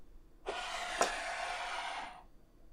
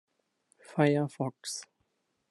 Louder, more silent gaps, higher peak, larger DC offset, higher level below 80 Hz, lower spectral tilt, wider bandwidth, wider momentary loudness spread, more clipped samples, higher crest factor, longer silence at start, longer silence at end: second, -38 LUFS vs -31 LUFS; neither; second, -14 dBFS vs -10 dBFS; neither; first, -58 dBFS vs -78 dBFS; second, -0.5 dB/octave vs -5.5 dB/octave; first, 15.5 kHz vs 12 kHz; about the same, 14 LU vs 12 LU; neither; about the same, 26 dB vs 22 dB; second, 0 s vs 0.7 s; second, 0 s vs 0.65 s